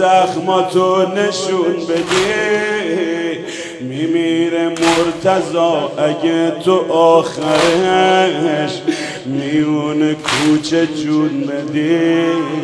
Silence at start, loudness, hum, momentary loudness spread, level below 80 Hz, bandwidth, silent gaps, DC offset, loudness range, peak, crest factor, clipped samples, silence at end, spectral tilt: 0 s; -15 LUFS; none; 7 LU; -54 dBFS; 11 kHz; none; under 0.1%; 3 LU; 0 dBFS; 14 dB; under 0.1%; 0 s; -4.5 dB/octave